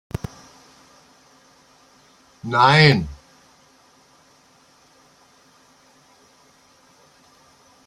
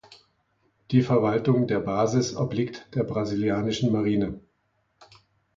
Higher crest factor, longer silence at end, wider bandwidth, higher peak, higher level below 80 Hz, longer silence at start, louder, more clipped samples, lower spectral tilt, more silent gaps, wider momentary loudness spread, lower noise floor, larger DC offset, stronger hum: first, 24 dB vs 18 dB; first, 4.7 s vs 0.55 s; first, 11 kHz vs 7.6 kHz; first, -2 dBFS vs -8 dBFS; first, -50 dBFS vs -56 dBFS; first, 2.45 s vs 0.1 s; first, -17 LUFS vs -25 LUFS; neither; second, -5.5 dB/octave vs -7 dB/octave; neither; first, 24 LU vs 8 LU; second, -55 dBFS vs -71 dBFS; neither; neither